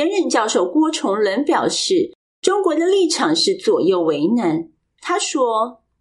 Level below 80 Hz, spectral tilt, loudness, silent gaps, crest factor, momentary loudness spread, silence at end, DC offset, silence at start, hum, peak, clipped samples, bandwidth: -68 dBFS; -3.5 dB/octave; -18 LUFS; 2.15-2.42 s; 16 dB; 7 LU; 0.3 s; under 0.1%; 0 s; none; -2 dBFS; under 0.1%; 11.5 kHz